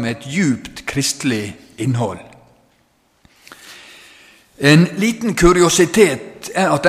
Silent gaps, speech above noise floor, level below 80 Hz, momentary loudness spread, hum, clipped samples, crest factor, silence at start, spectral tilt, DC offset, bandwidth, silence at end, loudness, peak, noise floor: none; 44 dB; -38 dBFS; 16 LU; none; under 0.1%; 18 dB; 0 s; -4.5 dB/octave; under 0.1%; 15.5 kHz; 0 s; -16 LUFS; 0 dBFS; -59 dBFS